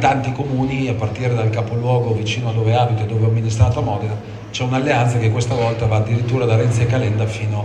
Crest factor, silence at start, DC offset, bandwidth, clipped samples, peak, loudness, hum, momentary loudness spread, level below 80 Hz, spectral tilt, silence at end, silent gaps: 16 dB; 0 s; under 0.1%; 9.2 kHz; under 0.1%; 0 dBFS; -18 LUFS; none; 5 LU; -42 dBFS; -6.5 dB/octave; 0 s; none